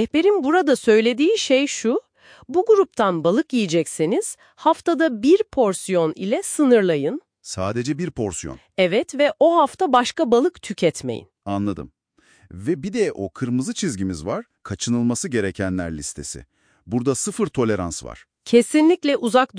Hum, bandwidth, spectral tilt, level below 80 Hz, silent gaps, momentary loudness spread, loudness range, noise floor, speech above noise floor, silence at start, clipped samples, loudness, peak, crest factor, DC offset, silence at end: none; 10.5 kHz; -5 dB/octave; -52 dBFS; none; 13 LU; 6 LU; -57 dBFS; 38 dB; 0 s; under 0.1%; -20 LUFS; -4 dBFS; 16 dB; under 0.1%; 0 s